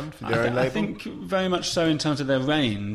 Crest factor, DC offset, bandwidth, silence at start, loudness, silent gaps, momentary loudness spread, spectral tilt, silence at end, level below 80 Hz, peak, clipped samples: 16 dB; under 0.1%; 15 kHz; 0 s; -24 LUFS; none; 6 LU; -5 dB/octave; 0 s; -50 dBFS; -8 dBFS; under 0.1%